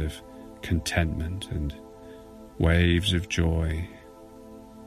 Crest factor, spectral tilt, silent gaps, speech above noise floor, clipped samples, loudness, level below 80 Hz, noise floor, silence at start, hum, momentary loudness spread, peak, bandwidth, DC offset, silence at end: 20 dB; -5.5 dB/octave; none; 22 dB; under 0.1%; -26 LUFS; -34 dBFS; -47 dBFS; 0 s; none; 24 LU; -8 dBFS; 14 kHz; under 0.1%; 0 s